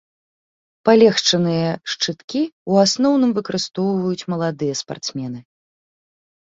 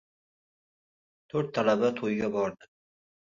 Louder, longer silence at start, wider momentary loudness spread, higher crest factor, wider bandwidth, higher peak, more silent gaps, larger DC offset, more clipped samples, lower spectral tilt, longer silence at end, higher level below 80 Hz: first, -19 LUFS vs -29 LUFS; second, 0.85 s vs 1.35 s; first, 13 LU vs 8 LU; about the same, 18 dB vs 20 dB; about the same, 7.8 kHz vs 7.4 kHz; first, -2 dBFS vs -12 dBFS; first, 2.24-2.28 s, 2.52-2.66 s vs none; neither; neither; second, -4.5 dB/octave vs -6.5 dB/octave; first, 1.1 s vs 0.7 s; first, -62 dBFS vs -68 dBFS